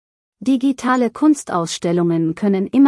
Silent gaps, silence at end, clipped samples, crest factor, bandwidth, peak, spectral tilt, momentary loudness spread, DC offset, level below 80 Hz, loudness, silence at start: none; 0 s; under 0.1%; 14 dB; 12 kHz; -4 dBFS; -6 dB/octave; 4 LU; under 0.1%; -62 dBFS; -18 LUFS; 0.4 s